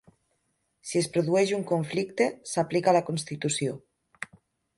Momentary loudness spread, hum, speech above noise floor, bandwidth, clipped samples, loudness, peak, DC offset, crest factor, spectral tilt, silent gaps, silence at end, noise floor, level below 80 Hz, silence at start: 18 LU; none; 49 dB; 11.5 kHz; under 0.1%; -27 LUFS; -10 dBFS; under 0.1%; 20 dB; -5 dB/octave; none; 0.5 s; -75 dBFS; -68 dBFS; 0.85 s